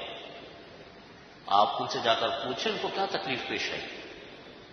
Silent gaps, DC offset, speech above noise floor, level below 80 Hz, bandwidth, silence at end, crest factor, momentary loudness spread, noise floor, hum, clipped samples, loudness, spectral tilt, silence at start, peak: none; under 0.1%; 21 dB; -66 dBFS; 6.6 kHz; 0 s; 24 dB; 23 LU; -50 dBFS; none; under 0.1%; -29 LUFS; -3.5 dB/octave; 0 s; -8 dBFS